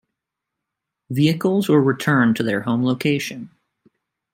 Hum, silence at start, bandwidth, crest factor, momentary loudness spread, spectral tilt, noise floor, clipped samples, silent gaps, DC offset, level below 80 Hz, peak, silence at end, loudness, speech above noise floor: none; 1.1 s; 16.5 kHz; 18 dB; 9 LU; -6.5 dB/octave; -82 dBFS; under 0.1%; none; under 0.1%; -64 dBFS; -4 dBFS; 0.85 s; -19 LUFS; 64 dB